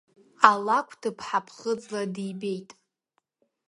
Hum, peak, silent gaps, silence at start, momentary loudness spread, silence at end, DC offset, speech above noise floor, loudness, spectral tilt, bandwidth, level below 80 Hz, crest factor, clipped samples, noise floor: none; 0 dBFS; none; 0.4 s; 14 LU; 0.95 s; under 0.1%; 50 dB; -26 LUFS; -4.5 dB/octave; 11.5 kHz; -74 dBFS; 28 dB; under 0.1%; -77 dBFS